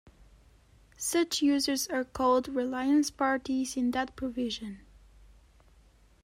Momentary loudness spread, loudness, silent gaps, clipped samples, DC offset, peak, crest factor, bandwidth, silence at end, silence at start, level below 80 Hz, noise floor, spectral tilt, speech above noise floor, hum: 8 LU; -29 LUFS; none; under 0.1%; under 0.1%; -16 dBFS; 16 dB; 16 kHz; 1.45 s; 1 s; -58 dBFS; -61 dBFS; -2.5 dB/octave; 32 dB; none